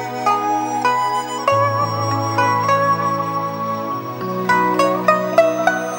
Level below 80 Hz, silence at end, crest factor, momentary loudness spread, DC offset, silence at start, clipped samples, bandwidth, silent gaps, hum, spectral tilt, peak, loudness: -62 dBFS; 0 s; 18 dB; 7 LU; under 0.1%; 0 s; under 0.1%; 16.5 kHz; none; none; -5 dB/octave; 0 dBFS; -18 LUFS